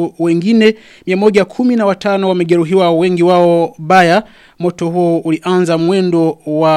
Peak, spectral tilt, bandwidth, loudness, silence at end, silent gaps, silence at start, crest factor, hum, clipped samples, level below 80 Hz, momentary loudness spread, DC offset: 0 dBFS; -6.5 dB/octave; 12 kHz; -12 LUFS; 0 s; none; 0 s; 12 dB; none; under 0.1%; -54 dBFS; 6 LU; under 0.1%